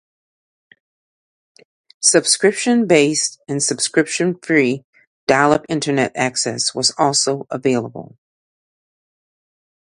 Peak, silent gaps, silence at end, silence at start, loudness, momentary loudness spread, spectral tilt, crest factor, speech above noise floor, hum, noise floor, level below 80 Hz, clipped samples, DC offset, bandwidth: 0 dBFS; 4.84-4.93 s, 5.07-5.27 s; 1.75 s; 2 s; -17 LUFS; 7 LU; -3 dB/octave; 20 dB; over 73 dB; none; under -90 dBFS; -60 dBFS; under 0.1%; under 0.1%; 11.5 kHz